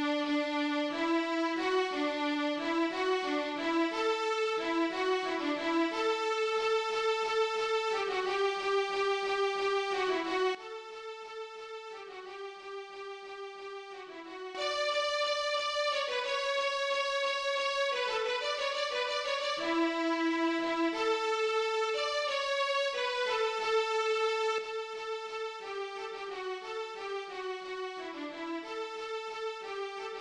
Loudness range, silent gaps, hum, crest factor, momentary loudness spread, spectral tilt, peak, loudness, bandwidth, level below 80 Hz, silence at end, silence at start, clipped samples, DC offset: 8 LU; none; none; 14 dB; 13 LU; -1.5 dB/octave; -18 dBFS; -32 LUFS; 11 kHz; -72 dBFS; 0 s; 0 s; under 0.1%; under 0.1%